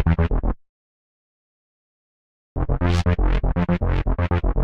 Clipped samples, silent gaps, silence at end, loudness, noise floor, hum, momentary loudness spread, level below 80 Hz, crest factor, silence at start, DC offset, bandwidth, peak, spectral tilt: under 0.1%; 0.69-2.56 s; 0 s; -23 LUFS; under -90 dBFS; none; 9 LU; -26 dBFS; 14 dB; 0 s; under 0.1%; 7.8 kHz; -8 dBFS; -8 dB/octave